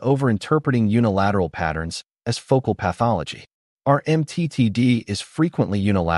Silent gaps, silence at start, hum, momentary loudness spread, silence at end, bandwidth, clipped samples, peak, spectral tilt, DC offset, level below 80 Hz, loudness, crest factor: 3.53-3.77 s; 0 s; none; 9 LU; 0 s; 11.5 kHz; under 0.1%; -4 dBFS; -7 dB/octave; under 0.1%; -46 dBFS; -21 LUFS; 16 dB